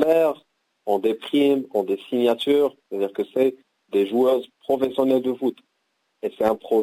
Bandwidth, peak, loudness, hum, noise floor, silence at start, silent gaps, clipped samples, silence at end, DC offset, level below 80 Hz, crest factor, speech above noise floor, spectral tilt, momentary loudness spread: 16 kHz; -8 dBFS; -22 LUFS; none; -72 dBFS; 0 s; none; under 0.1%; 0 s; under 0.1%; -68 dBFS; 14 dB; 51 dB; -6 dB/octave; 8 LU